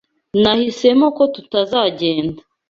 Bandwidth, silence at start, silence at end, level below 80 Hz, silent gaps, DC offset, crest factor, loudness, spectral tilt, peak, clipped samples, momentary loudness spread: 7.6 kHz; 0.35 s; 0.3 s; -52 dBFS; none; under 0.1%; 16 dB; -16 LUFS; -5.5 dB/octave; -2 dBFS; under 0.1%; 8 LU